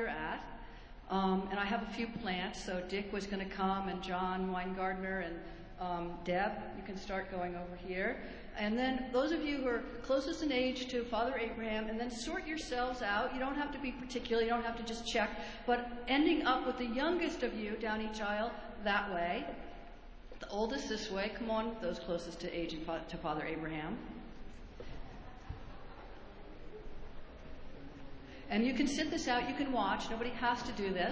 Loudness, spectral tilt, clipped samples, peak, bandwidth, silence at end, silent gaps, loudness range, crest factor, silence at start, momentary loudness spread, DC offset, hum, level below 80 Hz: -37 LUFS; -5 dB/octave; under 0.1%; -18 dBFS; 8 kHz; 0 s; none; 9 LU; 18 dB; 0 s; 18 LU; under 0.1%; none; -54 dBFS